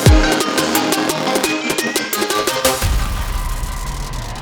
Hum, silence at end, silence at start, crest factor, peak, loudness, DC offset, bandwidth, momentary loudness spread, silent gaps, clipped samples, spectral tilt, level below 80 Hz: none; 0 s; 0 s; 16 dB; 0 dBFS; -17 LUFS; under 0.1%; over 20 kHz; 10 LU; none; under 0.1%; -4 dB/octave; -22 dBFS